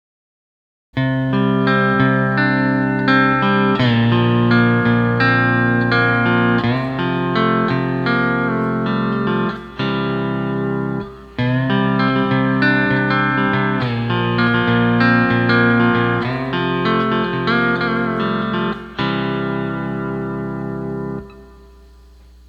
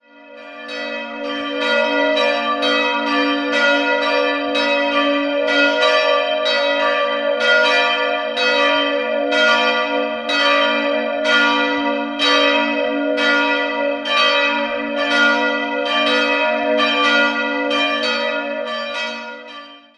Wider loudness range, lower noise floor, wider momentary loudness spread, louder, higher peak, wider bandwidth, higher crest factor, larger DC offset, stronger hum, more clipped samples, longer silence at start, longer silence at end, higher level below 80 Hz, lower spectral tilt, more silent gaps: first, 6 LU vs 2 LU; first, -44 dBFS vs -39 dBFS; about the same, 9 LU vs 9 LU; about the same, -17 LUFS vs -16 LUFS; about the same, 0 dBFS vs -2 dBFS; second, 5.8 kHz vs 11 kHz; about the same, 16 dB vs 16 dB; neither; neither; neither; first, 0.95 s vs 0.2 s; first, 1 s vs 0.2 s; first, -44 dBFS vs -64 dBFS; first, -8.5 dB/octave vs -2 dB/octave; neither